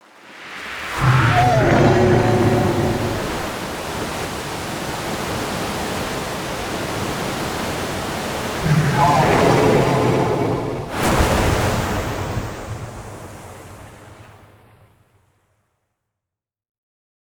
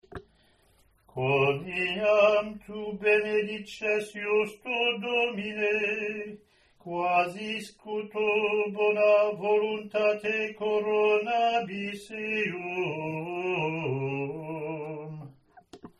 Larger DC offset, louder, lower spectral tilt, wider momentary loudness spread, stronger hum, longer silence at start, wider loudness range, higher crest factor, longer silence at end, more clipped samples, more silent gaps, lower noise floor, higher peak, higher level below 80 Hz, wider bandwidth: neither; first, -19 LUFS vs -28 LUFS; about the same, -5.5 dB/octave vs -5.5 dB/octave; first, 17 LU vs 13 LU; neither; first, 0.25 s vs 0.1 s; first, 10 LU vs 6 LU; about the same, 18 dB vs 18 dB; first, 3.05 s vs 0.1 s; neither; neither; first, -86 dBFS vs -64 dBFS; first, -2 dBFS vs -10 dBFS; first, -36 dBFS vs -66 dBFS; first, over 20 kHz vs 12 kHz